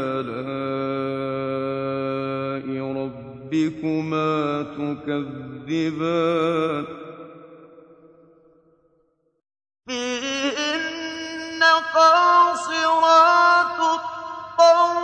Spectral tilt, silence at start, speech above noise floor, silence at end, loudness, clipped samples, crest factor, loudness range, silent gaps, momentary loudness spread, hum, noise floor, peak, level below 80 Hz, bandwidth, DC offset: -4.5 dB/octave; 0 s; 42 dB; 0 s; -21 LUFS; under 0.1%; 18 dB; 13 LU; none; 15 LU; none; -66 dBFS; -4 dBFS; -64 dBFS; 9.6 kHz; under 0.1%